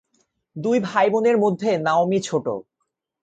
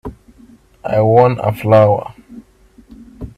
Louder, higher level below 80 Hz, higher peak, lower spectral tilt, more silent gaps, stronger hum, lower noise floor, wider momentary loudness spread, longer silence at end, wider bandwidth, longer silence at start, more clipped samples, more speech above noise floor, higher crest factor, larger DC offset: second, -21 LUFS vs -13 LUFS; second, -66 dBFS vs -42 dBFS; second, -6 dBFS vs 0 dBFS; second, -6 dB/octave vs -9 dB/octave; neither; neither; first, -77 dBFS vs -47 dBFS; second, 11 LU vs 22 LU; first, 0.6 s vs 0.05 s; second, 9 kHz vs 13.5 kHz; first, 0.55 s vs 0.05 s; neither; first, 57 dB vs 35 dB; about the same, 16 dB vs 16 dB; neither